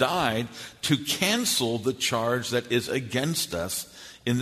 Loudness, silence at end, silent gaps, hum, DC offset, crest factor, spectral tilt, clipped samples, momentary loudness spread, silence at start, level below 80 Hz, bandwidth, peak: -26 LUFS; 0 s; none; none; under 0.1%; 20 dB; -3.5 dB/octave; under 0.1%; 9 LU; 0 s; -58 dBFS; 13.5 kHz; -8 dBFS